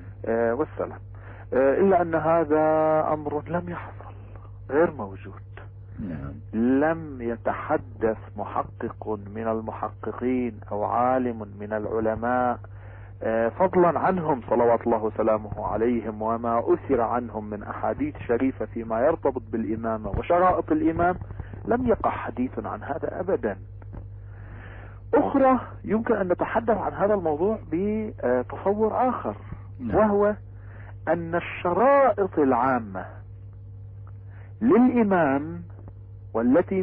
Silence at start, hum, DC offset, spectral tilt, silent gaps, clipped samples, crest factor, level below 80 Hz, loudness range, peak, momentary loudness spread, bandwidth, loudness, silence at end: 0 s; none; under 0.1%; -12 dB/octave; none; under 0.1%; 14 dB; -46 dBFS; 5 LU; -10 dBFS; 21 LU; 3.8 kHz; -25 LUFS; 0 s